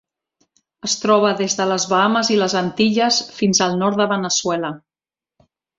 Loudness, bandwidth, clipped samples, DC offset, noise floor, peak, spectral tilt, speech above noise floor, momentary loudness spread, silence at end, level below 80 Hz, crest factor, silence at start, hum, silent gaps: -17 LUFS; 7.8 kHz; under 0.1%; under 0.1%; under -90 dBFS; -2 dBFS; -3.5 dB/octave; over 72 dB; 7 LU; 1 s; -60 dBFS; 18 dB; 0.85 s; none; none